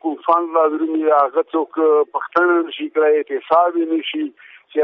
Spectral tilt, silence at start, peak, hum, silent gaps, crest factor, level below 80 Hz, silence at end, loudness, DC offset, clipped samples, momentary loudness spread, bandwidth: -0.5 dB/octave; 0.05 s; -4 dBFS; none; none; 14 dB; -72 dBFS; 0 s; -17 LUFS; under 0.1%; under 0.1%; 7 LU; 5.4 kHz